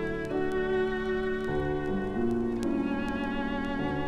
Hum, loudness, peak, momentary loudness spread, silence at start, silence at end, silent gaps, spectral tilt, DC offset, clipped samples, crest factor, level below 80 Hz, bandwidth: none; -30 LUFS; -16 dBFS; 3 LU; 0 s; 0 s; none; -7 dB/octave; under 0.1%; under 0.1%; 14 dB; -44 dBFS; 11 kHz